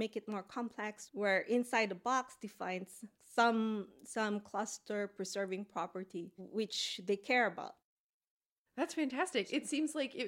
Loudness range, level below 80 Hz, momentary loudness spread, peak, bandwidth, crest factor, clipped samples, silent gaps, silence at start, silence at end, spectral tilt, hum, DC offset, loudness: 4 LU; -86 dBFS; 12 LU; -18 dBFS; 16.5 kHz; 20 dB; under 0.1%; 7.84-8.21 s, 8.27-8.40 s, 8.46-8.65 s; 0 s; 0 s; -3.5 dB/octave; none; under 0.1%; -37 LUFS